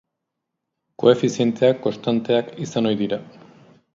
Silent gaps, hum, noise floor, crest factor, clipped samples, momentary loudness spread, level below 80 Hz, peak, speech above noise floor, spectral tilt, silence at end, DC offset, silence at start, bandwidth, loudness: none; none; -80 dBFS; 22 dB; under 0.1%; 8 LU; -64 dBFS; 0 dBFS; 61 dB; -6 dB/octave; 0.7 s; under 0.1%; 1 s; 7.6 kHz; -21 LUFS